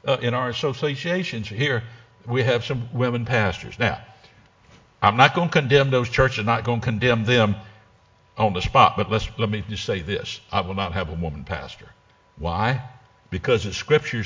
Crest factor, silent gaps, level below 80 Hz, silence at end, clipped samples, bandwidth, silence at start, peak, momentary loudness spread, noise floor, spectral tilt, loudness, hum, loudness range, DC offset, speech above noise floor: 22 dB; none; -42 dBFS; 0 s; under 0.1%; 7.6 kHz; 0.05 s; 0 dBFS; 12 LU; -56 dBFS; -6 dB/octave; -22 LUFS; none; 8 LU; under 0.1%; 35 dB